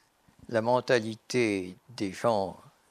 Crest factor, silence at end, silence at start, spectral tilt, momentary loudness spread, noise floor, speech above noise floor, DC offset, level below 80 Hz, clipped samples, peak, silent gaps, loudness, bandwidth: 20 dB; 0.35 s; 0.5 s; -5 dB/octave; 11 LU; -53 dBFS; 25 dB; under 0.1%; -72 dBFS; under 0.1%; -10 dBFS; none; -29 LUFS; 14.5 kHz